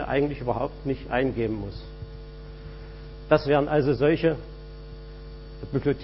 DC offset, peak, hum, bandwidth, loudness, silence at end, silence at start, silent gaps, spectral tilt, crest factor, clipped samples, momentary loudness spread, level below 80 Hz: under 0.1%; -6 dBFS; none; 5.8 kHz; -25 LUFS; 0 s; 0 s; none; -11 dB/octave; 22 dB; under 0.1%; 21 LU; -42 dBFS